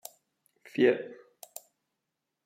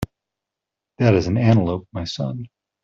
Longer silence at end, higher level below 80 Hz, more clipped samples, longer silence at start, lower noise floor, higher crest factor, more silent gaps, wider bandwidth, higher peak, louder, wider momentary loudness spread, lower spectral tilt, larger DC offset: first, 1.3 s vs 0.4 s; second, -88 dBFS vs -48 dBFS; neither; first, 0.75 s vs 0 s; about the same, -85 dBFS vs -85 dBFS; about the same, 22 dB vs 18 dB; neither; first, 16 kHz vs 7.4 kHz; second, -12 dBFS vs -4 dBFS; second, -28 LUFS vs -20 LUFS; first, 23 LU vs 17 LU; second, -5 dB/octave vs -7.5 dB/octave; neither